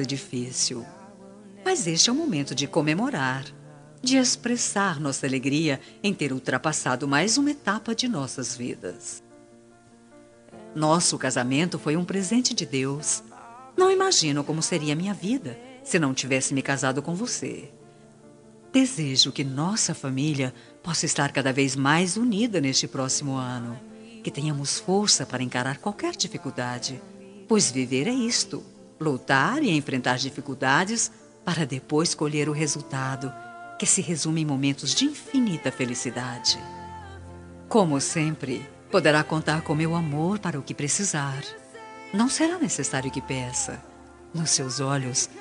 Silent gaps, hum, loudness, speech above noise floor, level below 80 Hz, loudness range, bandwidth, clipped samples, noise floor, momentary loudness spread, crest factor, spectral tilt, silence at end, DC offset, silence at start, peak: none; none; -25 LUFS; 28 dB; -64 dBFS; 3 LU; 10.5 kHz; under 0.1%; -53 dBFS; 14 LU; 22 dB; -3.5 dB/octave; 0 s; under 0.1%; 0 s; -4 dBFS